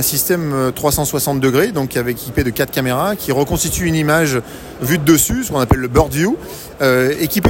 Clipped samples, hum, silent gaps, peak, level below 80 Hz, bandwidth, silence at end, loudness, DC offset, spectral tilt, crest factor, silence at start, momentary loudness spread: under 0.1%; none; none; 0 dBFS; -32 dBFS; 17 kHz; 0 s; -16 LUFS; under 0.1%; -4.5 dB/octave; 16 dB; 0 s; 6 LU